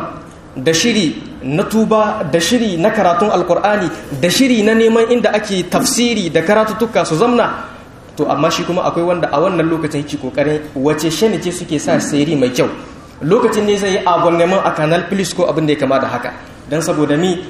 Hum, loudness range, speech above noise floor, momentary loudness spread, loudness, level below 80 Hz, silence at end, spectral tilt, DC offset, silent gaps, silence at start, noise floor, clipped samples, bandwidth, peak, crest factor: none; 3 LU; 21 dB; 9 LU; -14 LUFS; -44 dBFS; 0 s; -4.5 dB/octave; under 0.1%; none; 0 s; -35 dBFS; under 0.1%; 15 kHz; 0 dBFS; 14 dB